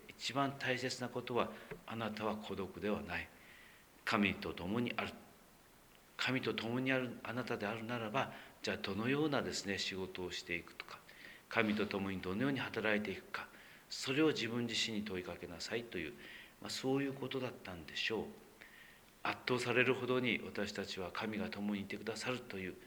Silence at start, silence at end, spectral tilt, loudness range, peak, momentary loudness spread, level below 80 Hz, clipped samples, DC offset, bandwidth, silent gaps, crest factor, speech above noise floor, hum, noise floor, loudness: 0 s; 0 s; -4.5 dB/octave; 4 LU; -14 dBFS; 16 LU; -70 dBFS; under 0.1%; under 0.1%; over 20 kHz; none; 26 dB; 25 dB; none; -64 dBFS; -39 LUFS